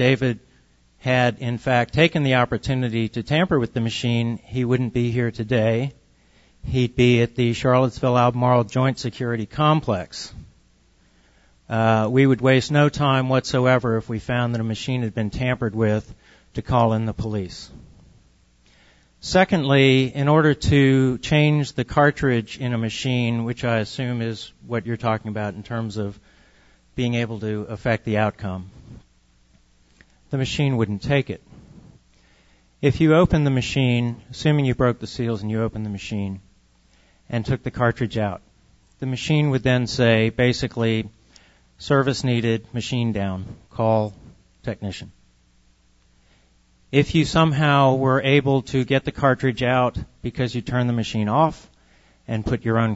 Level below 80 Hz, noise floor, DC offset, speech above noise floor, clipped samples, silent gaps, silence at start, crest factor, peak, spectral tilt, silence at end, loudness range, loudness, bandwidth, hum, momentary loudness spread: -44 dBFS; -58 dBFS; under 0.1%; 38 dB; under 0.1%; none; 0 s; 18 dB; -4 dBFS; -6.5 dB/octave; 0 s; 8 LU; -21 LUFS; 8 kHz; none; 12 LU